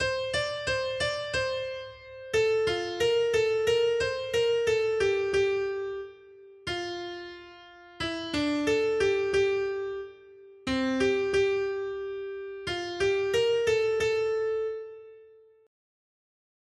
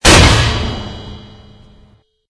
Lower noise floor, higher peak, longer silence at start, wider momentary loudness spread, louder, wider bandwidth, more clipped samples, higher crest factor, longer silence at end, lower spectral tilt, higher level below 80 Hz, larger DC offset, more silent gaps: first, -55 dBFS vs -49 dBFS; second, -14 dBFS vs 0 dBFS; about the same, 0 s vs 0.05 s; second, 14 LU vs 24 LU; second, -28 LUFS vs -10 LUFS; first, 12.5 kHz vs 11 kHz; second, under 0.1% vs 0.7%; about the same, 14 dB vs 14 dB; first, 1.4 s vs 1.1 s; about the same, -4 dB/octave vs -3.5 dB/octave; second, -56 dBFS vs -20 dBFS; neither; neither